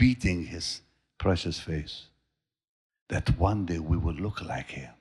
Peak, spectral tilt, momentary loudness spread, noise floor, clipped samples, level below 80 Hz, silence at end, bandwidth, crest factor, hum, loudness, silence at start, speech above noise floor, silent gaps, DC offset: -10 dBFS; -6 dB/octave; 11 LU; -82 dBFS; under 0.1%; -40 dBFS; 0.1 s; 11.5 kHz; 20 dB; none; -30 LUFS; 0 s; 53 dB; 2.68-2.90 s, 3.01-3.06 s; under 0.1%